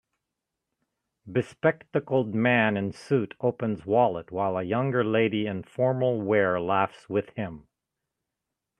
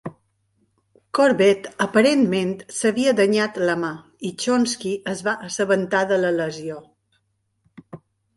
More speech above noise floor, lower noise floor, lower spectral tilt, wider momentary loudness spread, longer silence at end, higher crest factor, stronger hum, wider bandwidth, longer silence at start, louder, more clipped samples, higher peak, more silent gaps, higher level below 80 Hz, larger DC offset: first, 60 dB vs 50 dB; first, -85 dBFS vs -70 dBFS; first, -8 dB/octave vs -4.5 dB/octave; second, 8 LU vs 13 LU; first, 1.2 s vs 0.4 s; about the same, 20 dB vs 18 dB; neither; about the same, 10.5 kHz vs 11.5 kHz; first, 1.25 s vs 0.05 s; second, -26 LUFS vs -21 LUFS; neither; second, -8 dBFS vs -4 dBFS; neither; about the same, -66 dBFS vs -66 dBFS; neither